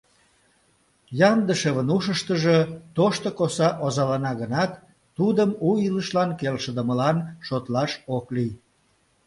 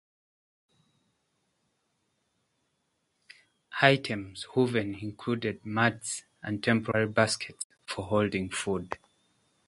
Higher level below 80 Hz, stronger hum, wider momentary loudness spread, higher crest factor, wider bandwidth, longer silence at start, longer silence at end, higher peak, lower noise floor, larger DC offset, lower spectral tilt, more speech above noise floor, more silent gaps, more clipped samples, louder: about the same, -60 dBFS vs -62 dBFS; neither; second, 8 LU vs 13 LU; second, 20 dB vs 28 dB; about the same, 11.5 kHz vs 11.5 kHz; second, 1.1 s vs 3.7 s; about the same, 0.7 s vs 0.7 s; about the same, -4 dBFS vs -2 dBFS; second, -65 dBFS vs -77 dBFS; neither; first, -6 dB/octave vs -4.5 dB/octave; second, 42 dB vs 48 dB; second, none vs 7.64-7.70 s; neither; first, -23 LUFS vs -29 LUFS